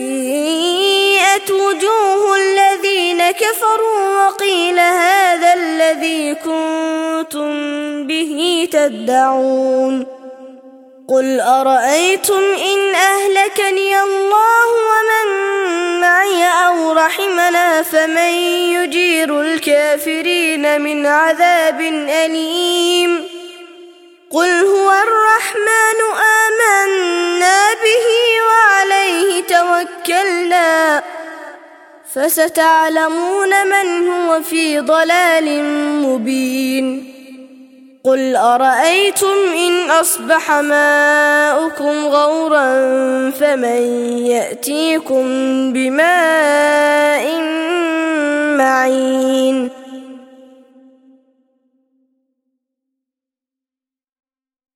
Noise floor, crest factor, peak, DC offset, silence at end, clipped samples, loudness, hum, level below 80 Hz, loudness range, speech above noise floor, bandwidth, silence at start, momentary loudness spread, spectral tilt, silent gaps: -89 dBFS; 14 dB; 0 dBFS; under 0.1%; 4.55 s; under 0.1%; -13 LUFS; none; -68 dBFS; 4 LU; 76 dB; 17 kHz; 0 s; 7 LU; -1 dB/octave; none